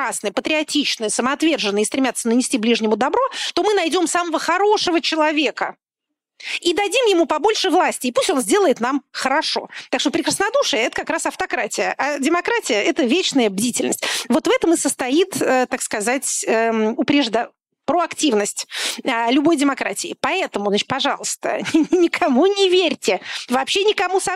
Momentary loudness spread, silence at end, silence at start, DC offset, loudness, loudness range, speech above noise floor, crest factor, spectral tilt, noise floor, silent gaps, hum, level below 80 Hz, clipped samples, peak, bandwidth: 6 LU; 0 s; 0 s; under 0.1%; -19 LUFS; 2 LU; 63 dB; 12 dB; -2.5 dB/octave; -82 dBFS; none; none; -60 dBFS; under 0.1%; -6 dBFS; 16 kHz